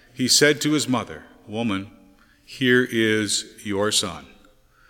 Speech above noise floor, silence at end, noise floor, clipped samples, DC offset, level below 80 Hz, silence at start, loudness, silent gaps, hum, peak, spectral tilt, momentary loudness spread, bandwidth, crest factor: 33 dB; 0.65 s; -55 dBFS; under 0.1%; under 0.1%; -60 dBFS; 0.15 s; -21 LUFS; none; none; -2 dBFS; -3 dB/octave; 19 LU; 17.5 kHz; 20 dB